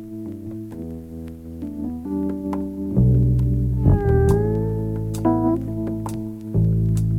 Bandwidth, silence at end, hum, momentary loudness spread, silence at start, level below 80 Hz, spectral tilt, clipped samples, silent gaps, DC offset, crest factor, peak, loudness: 13.5 kHz; 0 s; none; 16 LU; 0 s; -30 dBFS; -9.5 dB/octave; under 0.1%; none; under 0.1%; 18 dB; -2 dBFS; -21 LUFS